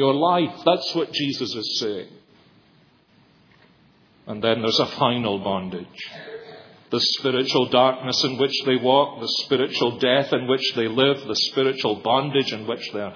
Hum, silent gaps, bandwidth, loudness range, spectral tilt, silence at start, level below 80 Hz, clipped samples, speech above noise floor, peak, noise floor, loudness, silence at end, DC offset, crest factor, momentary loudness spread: none; none; 5.4 kHz; 8 LU; -4.5 dB/octave; 0 s; -68 dBFS; under 0.1%; 35 dB; -2 dBFS; -57 dBFS; -21 LUFS; 0 s; under 0.1%; 20 dB; 10 LU